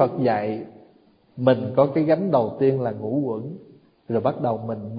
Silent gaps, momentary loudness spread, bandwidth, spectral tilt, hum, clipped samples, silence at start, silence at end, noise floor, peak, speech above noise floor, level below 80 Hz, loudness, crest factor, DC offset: none; 12 LU; 5.2 kHz; -12.5 dB/octave; none; under 0.1%; 0 s; 0 s; -57 dBFS; -2 dBFS; 35 dB; -62 dBFS; -23 LUFS; 20 dB; under 0.1%